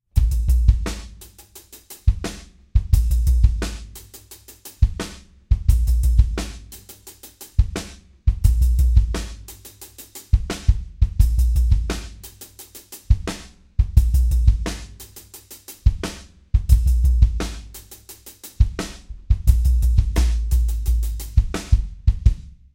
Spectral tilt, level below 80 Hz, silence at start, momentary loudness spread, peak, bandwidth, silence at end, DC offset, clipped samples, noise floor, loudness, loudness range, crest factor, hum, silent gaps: -6 dB/octave; -20 dBFS; 0.15 s; 21 LU; 0 dBFS; 16.5 kHz; 0.25 s; under 0.1%; under 0.1%; -45 dBFS; -22 LUFS; 2 LU; 18 dB; none; none